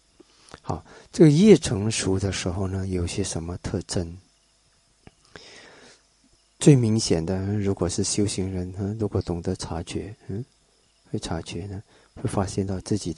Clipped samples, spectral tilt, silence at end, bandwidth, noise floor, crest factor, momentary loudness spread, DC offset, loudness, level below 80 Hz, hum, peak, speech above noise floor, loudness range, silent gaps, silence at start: under 0.1%; -6 dB/octave; 0.05 s; 11.5 kHz; -63 dBFS; 22 dB; 18 LU; under 0.1%; -24 LUFS; -42 dBFS; none; -2 dBFS; 39 dB; 11 LU; none; 0.65 s